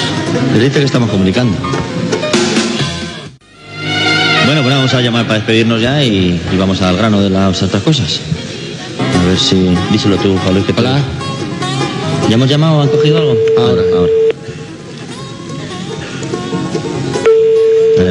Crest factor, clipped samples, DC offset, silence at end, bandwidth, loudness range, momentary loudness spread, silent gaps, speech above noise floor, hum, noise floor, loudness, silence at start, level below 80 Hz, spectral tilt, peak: 12 dB; under 0.1%; under 0.1%; 0 s; 11 kHz; 4 LU; 13 LU; none; 22 dB; none; -33 dBFS; -12 LUFS; 0 s; -44 dBFS; -5.5 dB/octave; 0 dBFS